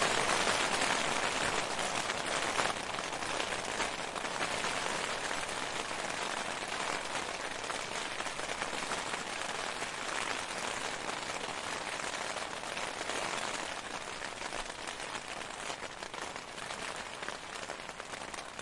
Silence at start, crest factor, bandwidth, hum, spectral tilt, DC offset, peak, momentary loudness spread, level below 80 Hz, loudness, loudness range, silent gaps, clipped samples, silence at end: 0 s; 26 dB; 11.5 kHz; none; -1.5 dB/octave; under 0.1%; -12 dBFS; 10 LU; -60 dBFS; -35 LUFS; 7 LU; none; under 0.1%; 0 s